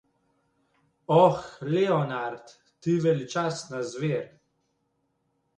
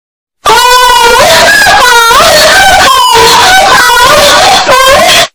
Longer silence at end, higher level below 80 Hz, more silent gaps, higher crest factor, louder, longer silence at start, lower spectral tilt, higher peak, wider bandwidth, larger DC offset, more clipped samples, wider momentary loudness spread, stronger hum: first, 1.3 s vs 0.05 s; second, -68 dBFS vs -26 dBFS; neither; first, 22 dB vs 2 dB; second, -26 LUFS vs -1 LUFS; first, 1.1 s vs 0.45 s; first, -6.5 dB/octave vs -0.5 dB/octave; second, -6 dBFS vs 0 dBFS; second, 9.6 kHz vs over 20 kHz; neither; second, under 0.1% vs 30%; first, 15 LU vs 1 LU; neither